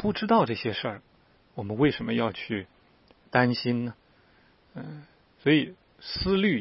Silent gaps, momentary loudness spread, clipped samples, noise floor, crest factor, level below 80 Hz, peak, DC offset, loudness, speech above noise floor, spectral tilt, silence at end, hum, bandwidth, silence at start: none; 20 LU; under 0.1%; -61 dBFS; 22 dB; -52 dBFS; -6 dBFS; under 0.1%; -27 LUFS; 35 dB; -10 dB/octave; 0 s; none; 5.8 kHz; 0 s